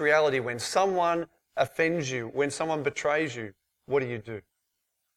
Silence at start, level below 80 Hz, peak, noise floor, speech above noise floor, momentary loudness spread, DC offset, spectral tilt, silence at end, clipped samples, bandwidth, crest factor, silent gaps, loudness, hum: 0 s; -68 dBFS; -10 dBFS; -80 dBFS; 52 dB; 13 LU; under 0.1%; -4.5 dB/octave; 0.75 s; under 0.1%; 15.5 kHz; 18 dB; none; -28 LUFS; none